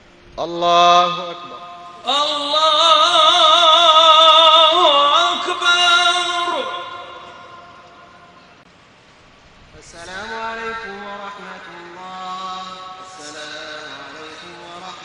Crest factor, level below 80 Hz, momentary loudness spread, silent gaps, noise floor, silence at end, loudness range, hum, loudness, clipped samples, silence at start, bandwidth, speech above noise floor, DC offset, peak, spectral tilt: 16 dB; -58 dBFS; 25 LU; none; -48 dBFS; 0 s; 21 LU; none; -12 LUFS; under 0.1%; 0.35 s; 11 kHz; 32 dB; under 0.1%; 0 dBFS; -1 dB/octave